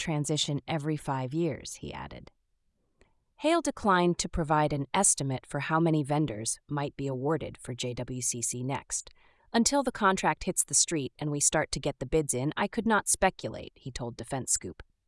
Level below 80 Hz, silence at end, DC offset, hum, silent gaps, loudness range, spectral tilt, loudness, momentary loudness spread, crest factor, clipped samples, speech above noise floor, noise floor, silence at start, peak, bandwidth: -52 dBFS; 0.25 s; under 0.1%; none; none; 6 LU; -3.5 dB/octave; -29 LUFS; 14 LU; 20 dB; under 0.1%; 44 dB; -74 dBFS; 0 s; -10 dBFS; 12 kHz